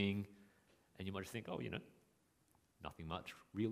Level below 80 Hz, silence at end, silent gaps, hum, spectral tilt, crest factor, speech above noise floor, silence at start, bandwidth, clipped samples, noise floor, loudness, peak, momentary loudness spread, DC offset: -70 dBFS; 0 s; none; none; -6 dB/octave; 24 dB; 31 dB; 0 s; 15.5 kHz; under 0.1%; -77 dBFS; -47 LUFS; -24 dBFS; 11 LU; under 0.1%